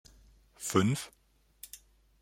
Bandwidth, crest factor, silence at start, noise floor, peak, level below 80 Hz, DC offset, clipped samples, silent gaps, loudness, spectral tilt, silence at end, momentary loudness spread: 16.5 kHz; 24 dB; 0.6 s; -61 dBFS; -12 dBFS; -64 dBFS; under 0.1%; under 0.1%; none; -31 LUFS; -5 dB/octave; 0.45 s; 22 LU